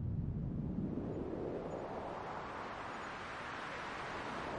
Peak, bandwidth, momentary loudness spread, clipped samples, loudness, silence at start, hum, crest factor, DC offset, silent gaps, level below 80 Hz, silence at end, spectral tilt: -28 dBFS; 11 kHz; 4 LU; under 0.1%; -43 LUFS; 0 s; none; 14 dB; under 0.1%; none; -54 dBFS; 0 s; -7 dB/octave